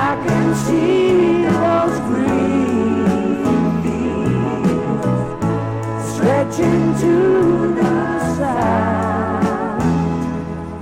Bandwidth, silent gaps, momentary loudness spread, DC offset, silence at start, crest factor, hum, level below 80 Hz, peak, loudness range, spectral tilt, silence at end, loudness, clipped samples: 15 kHz; none; 6 LU; under 0.1%; 0 s; 14 dB; none; -40 dBFS; -4 dBFS; 3 LU; -7 dB/octave; 0 s; -17 LUFS; under 0.1%